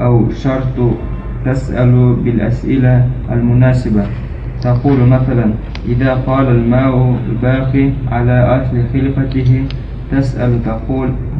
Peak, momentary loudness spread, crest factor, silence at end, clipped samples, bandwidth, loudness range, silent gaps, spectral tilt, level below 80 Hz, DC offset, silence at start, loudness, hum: 0 dBFS; 8 LU; 12 dB; 0 s; under 0.1%; 5.6 kHz; 1 LU; none; -10 dB/octave; -24 dBFS; under 0.1%; 0 s; -13 LUFS; none